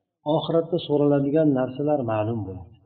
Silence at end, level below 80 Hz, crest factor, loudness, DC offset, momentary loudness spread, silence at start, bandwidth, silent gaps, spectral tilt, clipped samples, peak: 0.2 s; -62 dBFS; 14 dB; -23 LUFS; under 0.1%; 7 LU; 0.25 s; 4.5 kHz; none; -7 dB/octave; under 0.1%; -10 dBFS